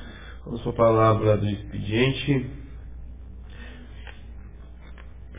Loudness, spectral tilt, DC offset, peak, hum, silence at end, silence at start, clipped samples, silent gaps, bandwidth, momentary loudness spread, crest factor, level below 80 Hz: -23 LUFS; -11 dB/octave; 0.3%; -8 dBFS; none; 0 s; 0 s; under 0.1%; none; 3.8 kHz; 25 LU; 18 dB; -42 dBFS